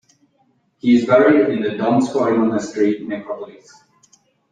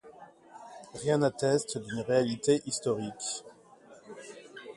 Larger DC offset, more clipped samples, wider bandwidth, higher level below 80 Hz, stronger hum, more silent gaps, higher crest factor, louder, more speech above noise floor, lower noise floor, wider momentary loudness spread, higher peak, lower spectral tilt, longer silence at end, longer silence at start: neither; neither; second, 9.4 kHz vs 11.5 kHz; first, -62 dBFS vs -70 dBFS; neither; neither; about the same, 16 dB vs 20 dB; first, -17 LUFS vs -30 LUFS; first, 45 dB vs 26 dB; first, -62 dBFS vs -55 dBFS; second, 15 LU vs 20 LU; first, -2 dBFS vs -12 dBFS; first, -6.5 dB/octave vs -4.5 dB/octave; first, 1 s vs 0.05 s; first, 0.85 s vs 0.05 s